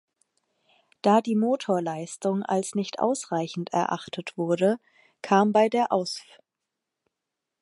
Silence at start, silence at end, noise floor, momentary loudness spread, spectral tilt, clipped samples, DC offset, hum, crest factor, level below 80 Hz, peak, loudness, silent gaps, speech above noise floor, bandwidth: 1.05 s; 1.4 s; -85 dBFS; 11 LU; -5.5 dB/octave; under 0.1%; under 0.1%; none; 20 dB; -78 dBFS; -6 dBFS; -25 LUFS; none; 60 dB; 11.5 kHz